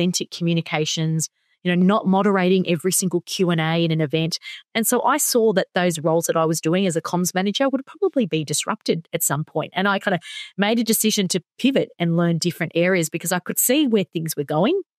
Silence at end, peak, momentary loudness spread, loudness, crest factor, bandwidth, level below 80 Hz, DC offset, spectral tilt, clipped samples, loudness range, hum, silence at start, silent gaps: 0.15 s; -2 dBFS; 6 LU; -21 LUFS; 18 dB; 15.5 kHz; -70 dBFS; under 0.1%; -4.5 dB/octave; under 0.1%; 2 LU; none; 0 s; none